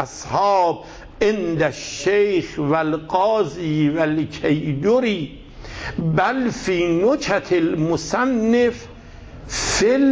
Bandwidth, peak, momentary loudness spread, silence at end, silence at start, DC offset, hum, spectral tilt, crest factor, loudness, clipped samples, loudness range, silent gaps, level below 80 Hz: 8 kHz; -4 dBFS; 11 LU; 0 s; 0 s; under 0.1%; none; -5 dB/octave; 14 dB; -20 LUFS; under 0.1%; 1 LU; none; -42 dBFS